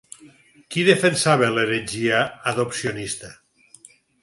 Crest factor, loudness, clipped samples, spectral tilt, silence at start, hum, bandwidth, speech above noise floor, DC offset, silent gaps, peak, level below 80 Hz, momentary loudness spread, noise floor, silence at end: 22 dB; -21 LUFS; under 0.1%; -4 dB/octave; 0.2 s; none; 11.5 kHz; 30 dB; under 0.1%; none; -2 dBFS; -60 dBFS; 12 LU; -51 dBFS; 0.9 s